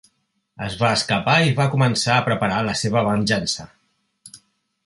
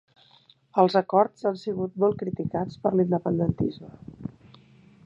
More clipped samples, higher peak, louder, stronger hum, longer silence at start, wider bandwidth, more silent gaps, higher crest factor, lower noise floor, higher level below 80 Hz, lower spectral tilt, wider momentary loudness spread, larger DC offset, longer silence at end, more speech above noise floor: neither; first, -2 dBFS vs -6 dBFS; first, -19 LUFS vs -25 LUFS; neither; second, 0.6 s vs 0.75 s; first, 11.5 kHz vs 7.4 kHz; neither; about the same, 20 dB vs 20 dB; first, -69 dBFS vs -59 dBFS; first, -50 dBFS vs -56 dBFS; second, -4.5 dB/octave vs -9 dB/octave; second, 8 LU vs 19 LU; neither; second, 0.5 s vs 0.75 s; first, 50 dB vs 34 dB